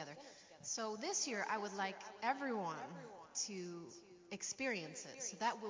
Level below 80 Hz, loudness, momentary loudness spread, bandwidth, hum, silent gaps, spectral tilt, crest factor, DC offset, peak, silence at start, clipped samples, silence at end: -88 dBFS; -43 LUFS; 14 LU; 7.8 kHz; none; none; -2 dB/octave; 20 dB; under 0.1%; -24 dBFS; 0 s; under 0.1%; 0 s